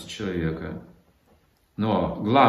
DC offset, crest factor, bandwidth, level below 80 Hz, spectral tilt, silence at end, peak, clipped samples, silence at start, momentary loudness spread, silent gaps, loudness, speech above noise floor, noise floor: under 0.1%; 22 dB; 13.5 kHz; -52 dBFS; -6.5 dB/octave; 0 s; -4 dBFS; under 0.1%; 0 s; 16 LU; none; -27 LUFS; 39 dB; -62 dBFS